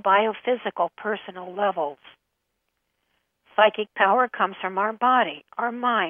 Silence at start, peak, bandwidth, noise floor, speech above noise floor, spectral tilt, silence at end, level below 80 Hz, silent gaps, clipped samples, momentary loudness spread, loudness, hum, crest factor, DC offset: 0.05 s; -2 dBFS; 3.7 kHz; -77 dBFS; 54 dB; -7 dB/octave; 0 s; -80 dBFS; none; under 0.1%; 10 LU; -23 LUFS; none; 22 dB; under 0.1%